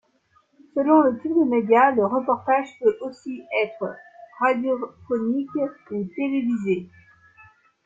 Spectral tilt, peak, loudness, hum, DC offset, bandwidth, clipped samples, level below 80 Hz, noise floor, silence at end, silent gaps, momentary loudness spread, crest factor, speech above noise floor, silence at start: -7.5 dB/octave; -4 dBFS; -23 LUFS; none; under 0.1%; 7.6 kHz; under 0.1%; -68 dBFS; -63 dBFS; 1 s; none; 14 LU; 18 dB; 41 dB; 0.75 s